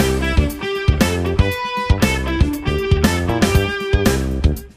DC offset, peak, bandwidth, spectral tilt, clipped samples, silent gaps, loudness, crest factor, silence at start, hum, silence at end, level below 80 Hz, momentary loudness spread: under 0.1%; -2 dBFS; 15.5 kHz; -5.5 dB/octave; under 0.1%; none; -18 LUFS; 16 dB; 0 s; none; 0.1 s; -22 dBFS; 4 LU